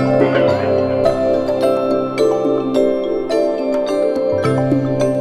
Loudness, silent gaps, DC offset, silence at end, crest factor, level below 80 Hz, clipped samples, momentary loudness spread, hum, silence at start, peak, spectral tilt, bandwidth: -16 LUFS; none; under 0.1%; 0 s; 14 dB; -46 dBFS; under 0.1%; 3 LU; none; 0 s; -2 dBFS; -7 dB/octave; 13.5 kHz